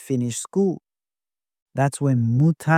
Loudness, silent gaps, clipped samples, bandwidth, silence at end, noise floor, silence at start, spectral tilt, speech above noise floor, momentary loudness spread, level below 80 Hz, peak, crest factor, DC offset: -22 LUFS; 1.62-1.66 s; under 0.1%; 15 kHz; 0 s; under -90 dBFS; 0 s; -6.5 dB/octave; over 70 dB; 8 LU; -62 dBFS; -6 dBFS; 16 dB; under 0.1%